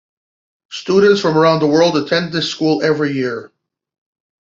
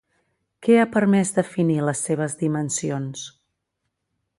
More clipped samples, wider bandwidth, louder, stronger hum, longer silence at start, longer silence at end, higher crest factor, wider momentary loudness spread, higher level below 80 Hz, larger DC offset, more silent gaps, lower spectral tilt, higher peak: neither; second, 7.6 kHz vs 11.5 kHz; first, -14 LUFS vs -22 LUFS; neither; about the same, 0.7 s vs 0.6 s; about the same, 1 s vs 1.1 s; about the same, 14 dB vs 18 dB; about the same, 11 LU vs 12 LU; about the same, -60 dBFS vs -64 dBFS; neither; neither; about the same, -5.5 dB/octave vs -5.5 dB/octave; about the same, -2 dBFS vs -4 dBFS